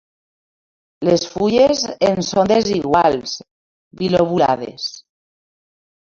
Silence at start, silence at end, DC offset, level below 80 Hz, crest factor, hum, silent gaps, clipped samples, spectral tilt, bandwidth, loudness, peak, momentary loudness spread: 1 s; 1.1 s; under 0.1%; -50 dBFS; 16 dB; none; 3.51-3.91 s; under 0.1%; -5 dB/octave; 7.6 kHz; -17 LUFS; -2 dBFS; 12 LU